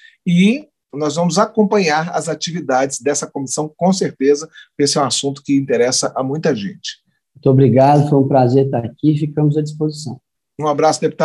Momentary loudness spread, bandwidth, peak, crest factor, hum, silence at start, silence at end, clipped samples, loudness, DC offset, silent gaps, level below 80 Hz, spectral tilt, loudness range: 10 LU; 12 kHz; -2 dBFS; 14 dB; none; 0.25 s; 0 s; under 0.1%; -16 LUFS; under 0.1%; none; -60 dBFS; -5.5 dB/octave; 3 LU